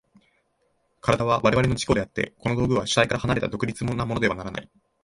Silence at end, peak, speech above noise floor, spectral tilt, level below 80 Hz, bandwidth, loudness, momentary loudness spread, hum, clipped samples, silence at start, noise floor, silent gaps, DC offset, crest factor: 0.4 s; -4 dBFS; 46 dB; -5.5 dB/octave; -44 dBFS; 11.5 kHz; -24 LUFS; 9 LU; none; under 0.1%; 1.05 s; -70 dBFS; none; under 0.1%; 20 dB